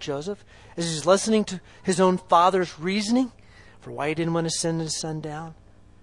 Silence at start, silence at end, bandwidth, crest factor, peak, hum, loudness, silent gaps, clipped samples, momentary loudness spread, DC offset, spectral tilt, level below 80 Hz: 0 s; 0.5 s; 11.5 kHz; 20 dB; -4 dBFS; none; -24 LUFS; none; under 0.1%; 16 LU; under 0.1%; -4.5 dB/octave; -56 dBFS